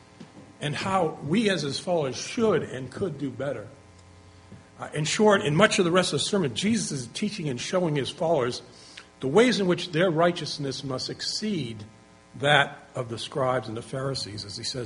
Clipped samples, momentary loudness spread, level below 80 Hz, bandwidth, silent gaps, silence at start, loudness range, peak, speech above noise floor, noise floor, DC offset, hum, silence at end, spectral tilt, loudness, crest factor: under 0.1%; 14 LU; -62 dBFS; 10.5 kHz; none; 0.2 s; 4 LU; -2 dBFS; 25 dB; -51 dBFS; under 0.1%; none; 0 s; -4.5 dB/octave; -26 LUFS; 24 dB